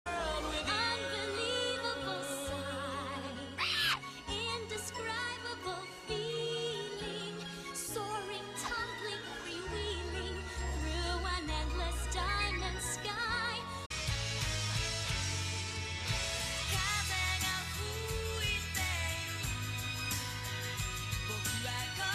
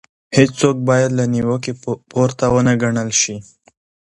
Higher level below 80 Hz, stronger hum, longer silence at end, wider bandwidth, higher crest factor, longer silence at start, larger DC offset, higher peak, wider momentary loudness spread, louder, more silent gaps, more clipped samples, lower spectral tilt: about the same, -46 dBFS vs -46 dBFS; neither; second, 0 s vs 0.7 s; first, 15.5 kHz vs 11.5 kHz; about the same, 16 dB vs 16 dB; second, 0.05 s vs 0.3 s; neither; second, -20 dBFS vs 0 dBFS; about the same, 7 LU vs 8 LU; second, -36 LUFS vs -17 LUFS; first, 13.86-13.90 s vs none; neither; second, -3 dB/octave vs -5 dB/octave